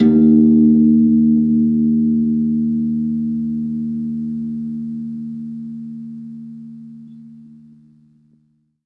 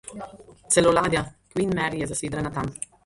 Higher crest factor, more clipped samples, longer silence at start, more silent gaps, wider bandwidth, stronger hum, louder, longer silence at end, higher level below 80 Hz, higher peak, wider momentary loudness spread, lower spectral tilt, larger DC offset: second, 14 dB vs 20 dB; neither; about the same, 0 s vs 0.05 s; neither; second, 2.1 kHz vs 11.5 kHz; neither; first, -16 LUFS vs -24 LUFS; first, 1.4 s vs 0.3 s; about the same, -48 dBFS vs -48 dBFS; first, -2 dBFS vs -6 dBFS; first, 22 LU vs 17 LU; first, -12 dB/octave vs -4 dB/octave; neither